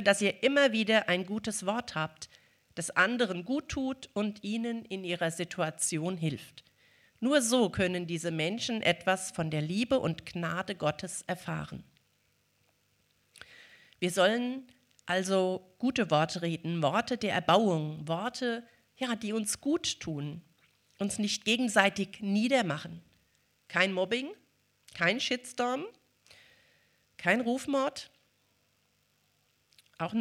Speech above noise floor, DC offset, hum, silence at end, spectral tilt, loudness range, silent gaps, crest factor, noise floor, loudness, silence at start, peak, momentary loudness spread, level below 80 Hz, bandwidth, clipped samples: 42 dB; under 0.1%; none; 0 s; -4 dB/octave; 5 LU; none; 26 dB; -72 dBFS; -31 LUFS; 0 s; -6 dBFS; 13 LU; -66 dBFS; 15.5 kHz; under 0.1%